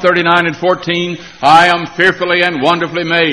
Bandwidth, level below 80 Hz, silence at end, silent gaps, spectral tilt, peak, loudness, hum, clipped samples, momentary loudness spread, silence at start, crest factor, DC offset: 11.5 kHz; -50 dBFS; 0 s; none; -5 dB/octave; 0 dBFS; -11 LUFS; none; 0.3%; 8 LU; 0 s; 12 dB; 0.3%